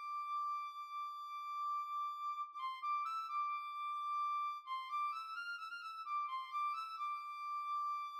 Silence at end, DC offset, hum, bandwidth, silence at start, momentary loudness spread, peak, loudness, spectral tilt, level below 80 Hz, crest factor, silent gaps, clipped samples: 0 s; under 0.1%; none; 14 kHz; 0 s; 6 LU; -32 dBFS; -42 LUFS; 5 dB/octave; under -90 dBFS; 10 dB; none; under 0.1%